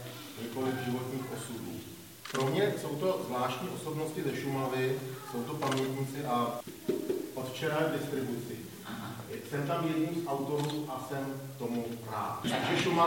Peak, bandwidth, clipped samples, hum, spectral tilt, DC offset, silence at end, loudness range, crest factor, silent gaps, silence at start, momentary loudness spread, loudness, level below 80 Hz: -14 dBFS; 17 kHz; under 0.1%; none; -5.5 dB/octave; under 0.1%; 0 s; 2 LU; 20 dB; none; 0 s; 10 LU; -34 LUFS; -70 dBFS